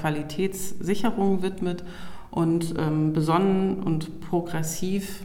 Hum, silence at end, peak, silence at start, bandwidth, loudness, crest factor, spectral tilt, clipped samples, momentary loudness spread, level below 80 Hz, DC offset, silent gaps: none; 0 s; -8 dBFS; 0 s; 17 kHz; -26 LUFS; 16 dB; -6.5 dB/octave; under 0.1%; 9 LU; -48 dBFS; under 0.1%; none